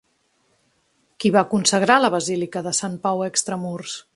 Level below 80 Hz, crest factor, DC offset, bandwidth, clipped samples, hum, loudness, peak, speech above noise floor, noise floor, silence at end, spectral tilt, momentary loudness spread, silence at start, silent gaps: -66 dBFS; 22 dB; under 0.1%; 11.5 kHz; under 0.1%; none; -20 LUFS; 0 dBFS; 45 dB; -66 dBFS; 0.15 s; -3.5 dB/octave; 11 LU; 1.2 s; none